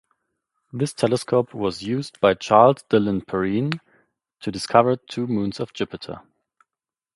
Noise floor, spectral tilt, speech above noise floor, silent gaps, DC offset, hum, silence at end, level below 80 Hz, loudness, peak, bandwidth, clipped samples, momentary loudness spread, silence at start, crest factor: -90 dBFS; -6 dB/octave; 69 dB; none; under 0.1%; none; 0.95 s; -56 dBFS; -21 LUFS; 0 dBFS; 11.5 kHz; under 0.1%; 16 LU; 0.75 s; 22 dB